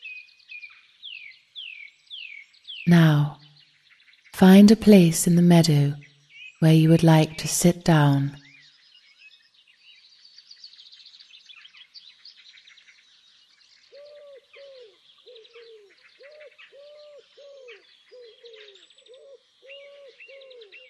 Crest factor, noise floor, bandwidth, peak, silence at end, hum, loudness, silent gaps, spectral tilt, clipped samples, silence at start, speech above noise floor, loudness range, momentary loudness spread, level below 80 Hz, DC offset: 22 dB; -59 dBFS; 13 kHz; -2 dBFS; 12.6 s; none; -18 LUFS; none; -6 dB/octave; under 0.1%; 0.05 s; 42 dB; 9 LU; 27 LU; -58 dBFS; under 0.1%